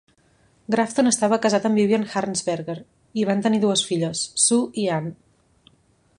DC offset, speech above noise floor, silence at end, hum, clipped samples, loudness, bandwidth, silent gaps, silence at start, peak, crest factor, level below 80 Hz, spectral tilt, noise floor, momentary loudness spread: under 0.1%; 40 dB; 1.05 s; none; under 0.1%; -21 LUFS; 11.5 kHz; none; 0.7 s; -4 dBFS; 18 dB; -64 dBFS; -4 dB/octave; -61 dBFS; 10 LU